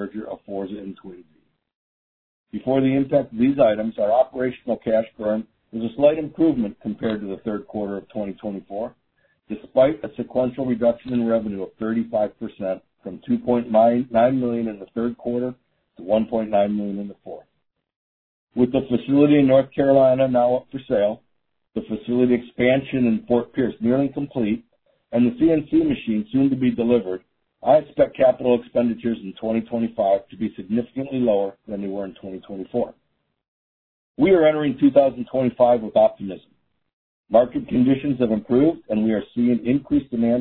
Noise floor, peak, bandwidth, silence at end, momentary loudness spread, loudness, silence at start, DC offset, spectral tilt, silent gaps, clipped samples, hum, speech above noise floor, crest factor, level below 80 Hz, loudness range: -74 dBFS; -2 dBFS; 4.2 kHz; 0 s; 14 LU; -21 LUFS; 0 s; under 0.1%; -11.5 dB/octave; 1.75-2.44 s, 17.96-18.47 s, 33.48-34.15 s, 36.93-37.24 s; under 0.1%; none; 53 dB; 18 dB; -54 dBFS; 6 LU